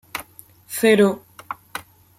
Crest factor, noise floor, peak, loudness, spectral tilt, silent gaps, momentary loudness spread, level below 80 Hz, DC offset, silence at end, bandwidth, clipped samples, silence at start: 18 dB; -48 dBFS; -4 dBFS; -18 LUFS; -4.5 dB/octave; none; 20 LU; -62 dBFS; under 0.1%; 0.4 s; 16.5 kHz; under 0.1%; 0.15 s